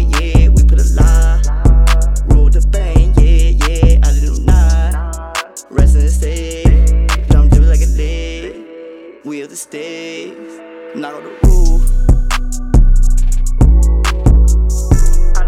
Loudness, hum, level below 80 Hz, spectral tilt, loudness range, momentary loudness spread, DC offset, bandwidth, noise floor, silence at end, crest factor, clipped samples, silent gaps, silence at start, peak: -13 LUFS; none; -10 dBFS; -6 dB/octave; 8 LU; 16 LU; under 0.1%; 12 kHz; -32 dBFS; 0 s; 8 dB; under 0.1%; none; 0 s; -2 dBFS